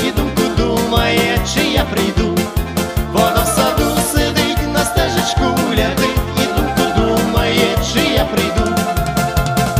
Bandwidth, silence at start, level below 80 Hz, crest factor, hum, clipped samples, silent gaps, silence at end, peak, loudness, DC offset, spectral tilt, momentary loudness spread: 16 kHz; 0 s; -24 dBFS; 14 dB; none; under 0.1%; none; 0 s; 0 dBFS; -15 LUFS; under 0.1%; -4.5 dB/octave; 3 LU